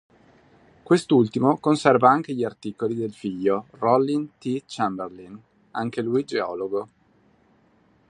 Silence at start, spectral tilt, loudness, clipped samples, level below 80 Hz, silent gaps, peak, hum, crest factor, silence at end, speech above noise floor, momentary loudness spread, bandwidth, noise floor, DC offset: 0.9 s; -6.5 dB/octave; -23 LUFS; under 0.1%; -66 dBFS; none; -2 dBFS; none; 22 dB; 1.25 s; 38 dB; 12 LU; 11 kHz; -60 dBFS; under 0.1%